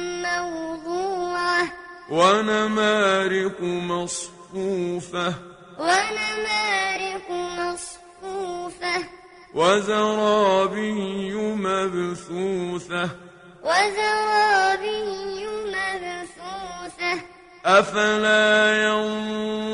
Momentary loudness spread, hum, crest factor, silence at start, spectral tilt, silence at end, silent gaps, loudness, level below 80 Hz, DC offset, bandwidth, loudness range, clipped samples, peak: 13 LU; none; 20 dB; 0 s; -3.5 dB/octave; 0 s; none; -22 LUFS; -58 dBFS; under 0.1%; 11 kHz; 5 LU; under 0.1%; -2 dBFS